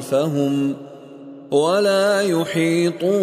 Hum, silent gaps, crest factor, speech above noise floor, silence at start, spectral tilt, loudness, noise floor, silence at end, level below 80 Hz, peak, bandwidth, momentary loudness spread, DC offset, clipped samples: none; none; 14 dB; 20 dB; 0 s; -5.5 dB/octave; -19 LUFS; -38 dBFS; 0 s; -70 dBFS; -6 dBFS; 15.5 kHz; 22 LU; under 0.1%; under 0.1%